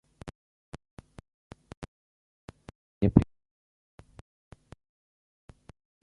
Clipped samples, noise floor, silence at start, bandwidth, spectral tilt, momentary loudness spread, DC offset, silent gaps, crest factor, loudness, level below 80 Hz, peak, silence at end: under 0.1%; under -90 dBFS; 0.25 s; 11 kHz; -9.5 dB/octave; 30 LU; under 0.1%; 0.35-0.72 s, 0.91-0.97 s, 1.34-1.50 s, 1.77-1.82 s, 1.88-2.48 s, 2.75-3.01 s; 32 dB; -26 LUFS; -48 dBFS; -2 dBFS; 2.8 s